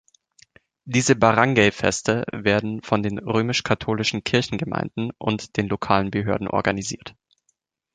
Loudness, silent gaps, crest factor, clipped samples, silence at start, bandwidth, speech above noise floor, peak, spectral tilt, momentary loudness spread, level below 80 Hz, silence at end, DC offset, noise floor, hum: -22 LUFS; none; 20 dB; under 0.1%; 0.85 s; 9.6 kHz; 50 dB; -2 dBFS; -4.5 dB/octave; 10 LU; -50 dBFS; 0.85 s; under 0.1%; -72 dBFS; none